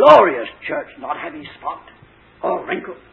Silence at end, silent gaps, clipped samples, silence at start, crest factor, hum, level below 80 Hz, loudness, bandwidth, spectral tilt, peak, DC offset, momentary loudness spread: 0.2 s; none; 0.2%; 0 s; 18 dB; none; -56 dBFS; -19 LUFS; 8 kHz; -6 dB/octave; 0 dBFS; under 0.1%; 17 LU